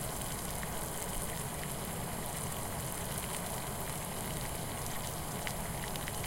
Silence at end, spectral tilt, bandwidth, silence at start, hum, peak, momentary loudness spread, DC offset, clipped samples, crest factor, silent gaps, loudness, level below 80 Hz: 0 s; -3.5 dB/octave; 17 kHz; 0 s; none; -18 dBFS; 1 LU; under 0.1%; under 0.1%; 20 dB; none; -38 LUFS; -48 dBFS